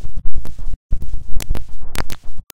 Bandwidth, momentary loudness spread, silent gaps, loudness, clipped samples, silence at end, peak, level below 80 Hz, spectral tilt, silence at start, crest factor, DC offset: 16 kHz; 6 LU; 0.76-0.89 s; -31 LUFS; 3%; 0 s; 0 dBFS; -24 dBFS; -4.5 dB/octave; 0 s; 10 dB; under 0.1%